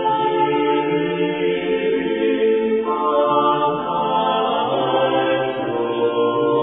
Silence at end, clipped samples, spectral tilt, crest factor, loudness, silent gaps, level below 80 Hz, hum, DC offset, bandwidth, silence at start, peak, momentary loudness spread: 0 s; under 0.1%; -9.5 dB/octave; 12 dB; -19 LUFS; none; -56 dBFS; none; under 0.1%; 3.8 kHz; 0 s; -6 dBFS; 4 LU